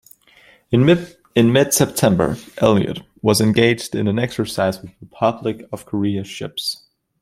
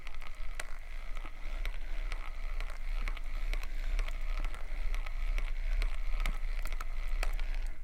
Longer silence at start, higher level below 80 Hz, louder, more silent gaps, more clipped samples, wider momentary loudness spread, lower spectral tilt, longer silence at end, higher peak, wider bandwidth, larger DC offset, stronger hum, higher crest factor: first, 0.7 s vs 0 s; second, -50 dBFS vs -34 dBFS; first, -18 LUFS vs -42 LUFS; neither; neither; first, 11 LU vs 7 LU; about the same, -5 dB/octave vs -4 dB/octave; first, 0.45 s vs 0 s; first, 0 dBFS vs -16 dBFS; first, 16.5 kHz vs 13.5 kHz; neither; neither; about the same, 18 dB vs 16 dB